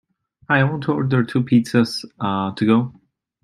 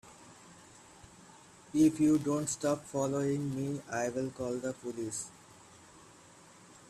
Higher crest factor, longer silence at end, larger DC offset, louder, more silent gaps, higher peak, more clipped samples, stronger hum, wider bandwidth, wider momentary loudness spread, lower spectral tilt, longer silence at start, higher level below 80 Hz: about the same, 18 dB vs 18 dB; second, 0.5 s vs 0.9 s; neither; first, -19 LUFS vs -33 LUFS; neither; first, -2 dBFS vs -16 dBFS; neither; neither; about the same, 12.5 kHz vs 13.5 kHz; second, 7 LU vs 26 LU; first, -7 dB/octave vs -5.5 dB/octave; first, 0.5 s vs 0.05 s; first, -60 dBFS vs -68 dBFS